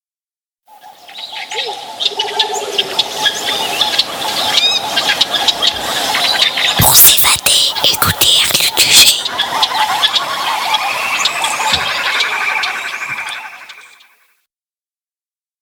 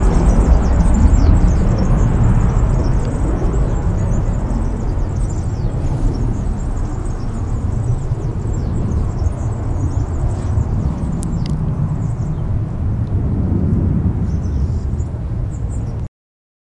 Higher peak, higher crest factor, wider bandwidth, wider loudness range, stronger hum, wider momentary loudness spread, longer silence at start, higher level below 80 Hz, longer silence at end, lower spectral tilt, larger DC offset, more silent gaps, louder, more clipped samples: about the same, 0 dBFS vs 0 dBFS; about the same, 14 dB vs 16 dB; first, over 20 kHz vs 10.5 kHz; first, 10 LU vs 6 LU; neither; first, 14 LU vs 8 LU; first, 0.85 s vs 0 s; second, -44 dBFS vs -18 dBFS; first, 1.75 s vs 0.7 s; second, 0 dB/octave vs -8.5 dB/octave; neither; neither; first, -11 LUFS vs -18 LUFS; first, 0.2% vs under 0.1%